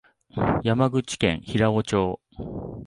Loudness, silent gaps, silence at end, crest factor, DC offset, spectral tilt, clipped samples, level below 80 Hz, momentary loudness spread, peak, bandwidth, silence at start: -24 LUFS; none; 0 s; 18 dB; under 0.1%; -6 dB/octave; under 0.1%; -46 dBFS; 13 LU; -6 dBFS; 11.5 kHz; 0.35 s